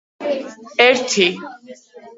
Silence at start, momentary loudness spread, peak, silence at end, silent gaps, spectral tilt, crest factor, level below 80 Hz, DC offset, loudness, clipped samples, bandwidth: 0.2 s; 16 LU; 0 dBFS; 0.1 s; none; -2.5 dB/octave; 20 dB; -68 dBFS; under 0.1%; -16 LUFS; under 0.1%; 8 kHz